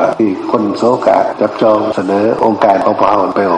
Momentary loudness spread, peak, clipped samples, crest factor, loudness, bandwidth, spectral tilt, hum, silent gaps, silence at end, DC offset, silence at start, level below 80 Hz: 4 LU; 0 dBFS; under 0.1%; 12 dB; -12 LUFS; 10.5 kHz; -7 dB/octave; none; none; 0 s; under 0.1%; 0 s; -52 dBFS